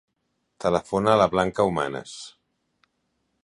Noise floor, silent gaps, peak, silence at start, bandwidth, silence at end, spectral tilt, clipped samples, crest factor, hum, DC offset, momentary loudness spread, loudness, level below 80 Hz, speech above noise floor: -75 dBFS; none; -4 dBFS; 0.6 s; 11.5 kHz; 1.15 s; -5.5 dB/octave; under 0.1%; 20 dB; none; under 0.1%; 20 LU; -23 LUFS; -54 dBFS; 52 dB